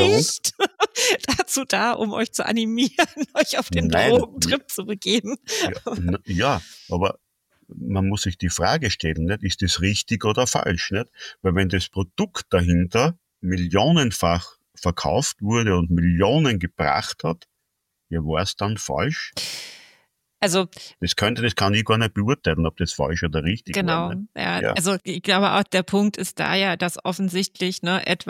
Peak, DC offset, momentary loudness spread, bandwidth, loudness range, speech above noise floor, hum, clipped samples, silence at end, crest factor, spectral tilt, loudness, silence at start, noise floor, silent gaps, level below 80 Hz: -4 dBFS; under 0.1%; 8 LU; 16.5 kHz; 4 LU; 55 dB; none; under 0.1%; 0 s; 18 dB; -4.5 dB/octave; -22 LUFS; 0 s; -77 dBFS; none; -42 dBFS